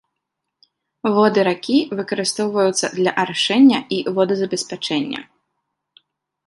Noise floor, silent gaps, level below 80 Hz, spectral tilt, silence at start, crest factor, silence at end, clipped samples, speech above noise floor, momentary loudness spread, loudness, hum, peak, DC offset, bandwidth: -79 dBFS; none; -68 dBFS; -4 dB/octave; 1.05 s; 18 dB; 1.25 s; under 0.1%; 61 dB; 10 LU; -18 LUFS; none; -2 dBFS; under 0.1%; 11.5 kHz